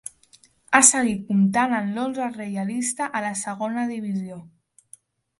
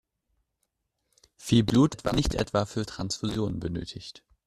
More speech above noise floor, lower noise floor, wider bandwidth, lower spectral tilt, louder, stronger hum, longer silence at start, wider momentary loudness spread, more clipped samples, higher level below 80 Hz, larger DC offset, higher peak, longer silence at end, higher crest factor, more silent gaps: second, 34 dB vs 53 dB; second, -57 dBFS vs -79 dBFS; second, 11.5 kHz vs 14 kHz; second, -3.5 dB/octave vs -6 dB/octave; first, -22 LUFS vs -27 LUFS; neither; second, 0.7 s vs 1.4 s; about the same, 15 LU vs 17 LU; neither; second, -64 dBFS vs -44 dBFS; neither; first, 0 dBFS vs -8 dBFS; first, 0.95 s vs 0.3 s; about the same, 24 dB vs 22 dB; neither